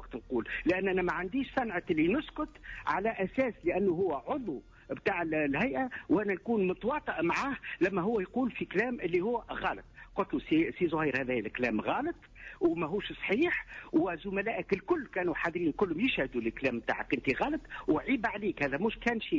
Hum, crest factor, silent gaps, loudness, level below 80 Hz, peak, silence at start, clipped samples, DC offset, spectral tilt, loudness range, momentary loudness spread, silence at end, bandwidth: none; 14 dB; none; -32 LUFS; -56 dBFS; -18 dBFS; 0 s; under 0.1%; under 0.1%; -7 dB/octave; 1 LU; 6 LU; 0 s; 7.6 kHz